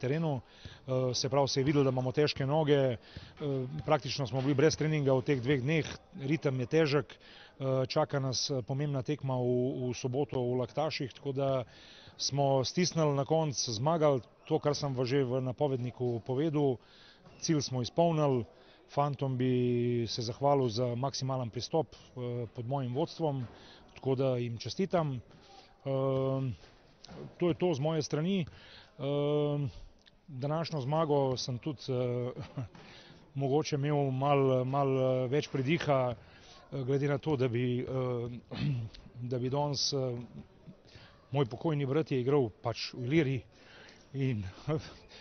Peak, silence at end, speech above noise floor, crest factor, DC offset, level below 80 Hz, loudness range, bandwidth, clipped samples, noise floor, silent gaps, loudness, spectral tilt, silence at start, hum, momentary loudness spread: -14 dBFS; 0 s; 25 dB; 18 dB; under 0.1%; -62 dBFS; 4 LU; 6.6 kHz; under 0.1%; -56 dBFS; none; -32 LUFS; -6 dB/octave; 0 s; none; 12 LU